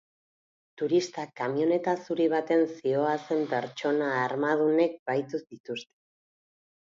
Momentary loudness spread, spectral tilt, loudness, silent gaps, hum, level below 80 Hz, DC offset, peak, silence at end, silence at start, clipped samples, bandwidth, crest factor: 12 LU; -6 dB/octave; -28 LUFS; 4.99-5.06 s, 5.60-5.64 s; none; -80 dBFS; under 0.1%; -12 dBFS; 1.05 s; 0.8 s; under 0.1%; 7.6 kHz; 16 dB